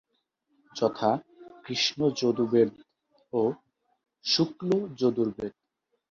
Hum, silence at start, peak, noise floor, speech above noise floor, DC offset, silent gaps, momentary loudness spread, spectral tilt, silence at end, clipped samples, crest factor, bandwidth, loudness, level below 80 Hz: none; 0.75 s; -10 dBFS; -76 dBFS; 49 dB; under 0.1%; none; 13 LU; -5 dB/octave; 0.6 s; under 0.1%; 20 dB; 7.4 kHz; -27 LUFS; -68 dBFS